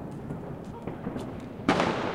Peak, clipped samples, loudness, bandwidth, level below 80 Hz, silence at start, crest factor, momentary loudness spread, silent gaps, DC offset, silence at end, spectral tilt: -8 dBFS; under 0.1%; -32 LUFS; 15.5 kHz; -52 dBFS; 0 s; 22 dB; 13 LU; none; under 0.1%; 0 s; -6 dB/octave